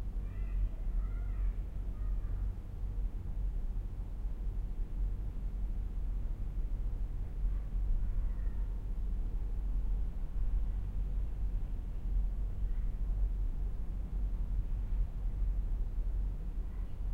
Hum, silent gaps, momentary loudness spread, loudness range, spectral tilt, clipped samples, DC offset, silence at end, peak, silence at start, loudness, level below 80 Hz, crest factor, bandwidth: none; none; 4 LU; 2 LU; -9 dB/octave; under 0.1%; under 0.1%; 0 s; -22 dBFS; 0 s; -40 LUFS; -34 dBFS; 12 dB; 2.9 kHz